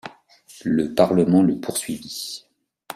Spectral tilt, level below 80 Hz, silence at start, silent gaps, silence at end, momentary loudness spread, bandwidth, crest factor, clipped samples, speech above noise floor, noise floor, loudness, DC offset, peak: -5.5 dB/octave; -58 dBFS; 0.05 s; none; 0 s; 16 LU; 16 kHz; 20 dB; under 0.1%; 29 dB; -49 dBFS; -21 LUFS; under 0.1%; -2 dBFS